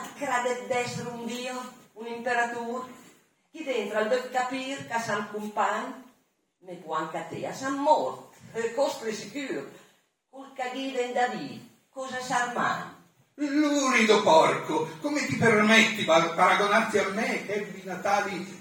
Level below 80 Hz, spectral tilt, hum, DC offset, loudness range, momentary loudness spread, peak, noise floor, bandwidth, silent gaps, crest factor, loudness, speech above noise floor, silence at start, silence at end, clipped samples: -76 dBFS; -3.5 dB/octave; none; under 0.1%; 10 LU; 18 LU; -6 dBFS; -69 dBFS; 18 kHz; none; 22 dB; -26 LUFS; 43 dB; 0 s; 0 s; under 0.1%